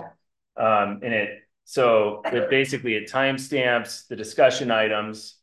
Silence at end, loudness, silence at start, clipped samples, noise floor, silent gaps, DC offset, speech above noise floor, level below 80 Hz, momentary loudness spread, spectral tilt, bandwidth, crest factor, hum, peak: 0.15 s; -22 LUFS; 0 s; under 0.1%; -54 dBFS; none; under 0.1%; 31 dB; -68 dBFS; 11 LU; -4 dB/octave; 12.5 kHz; 18 dB; none; -4 dBFS